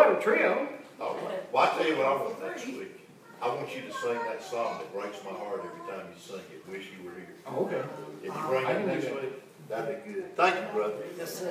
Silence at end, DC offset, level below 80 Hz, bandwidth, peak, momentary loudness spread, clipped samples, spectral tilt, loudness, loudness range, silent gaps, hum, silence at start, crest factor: 0 s; under 0.1%; -84 dBFS; 16 kHz; -6 dBFS; 17 LU; under 0.1%; -4.5 dB/octave; -31 LUFS; 7 LU; none; none; 0 s; 24 dB